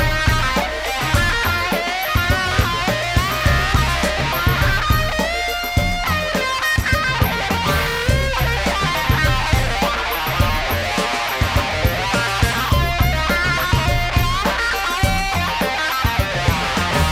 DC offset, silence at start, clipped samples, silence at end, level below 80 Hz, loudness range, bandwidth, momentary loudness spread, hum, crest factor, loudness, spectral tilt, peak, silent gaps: under 0.1%; 0 s; under 0.1%; 0 s; -24 dBFS; 1 LU; 16.5 kHz; 3 LU; none; 16 dB; -18 LUFS; -4 dB/octave; -2 dBFS; none